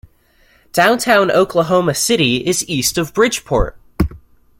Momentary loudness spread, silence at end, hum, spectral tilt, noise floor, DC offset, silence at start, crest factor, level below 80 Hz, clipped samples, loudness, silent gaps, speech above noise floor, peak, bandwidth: 9 LU; 0.4 s; none; -3.5 dB/octave; -53 dBFS; under 0.1%; 0.75 s; 16 dB; -32 dBFS; under 0.1%; -15 LUFS; none; 39 dB; 0 dBFS; 17 kHz